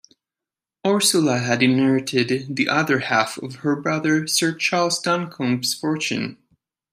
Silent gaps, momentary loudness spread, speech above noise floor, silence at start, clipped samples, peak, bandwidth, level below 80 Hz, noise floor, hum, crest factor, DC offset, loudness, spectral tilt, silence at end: none; 8 LU; 68 dB; 0.85 s; under 0.1%; -4 dBFS; 15.5 kHz; -66 dBFS; -89 dBFS; none; 18 dB; under 0.1%; -20 LUFS; -4 dB/octave; 0.6 s